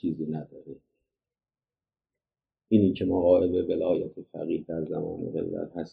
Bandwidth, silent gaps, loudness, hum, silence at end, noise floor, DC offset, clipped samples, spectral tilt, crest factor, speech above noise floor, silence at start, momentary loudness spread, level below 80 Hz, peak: 4.9 kHz; none; -27 LUFS; none; 0.05 s; under -90 dBFS; under 0.1%; under 0.1%; -10.5 dB/octave; 20 dB; over 63 dB; 0.05 s; 15 LU; -60 dBFS; -8 dBFS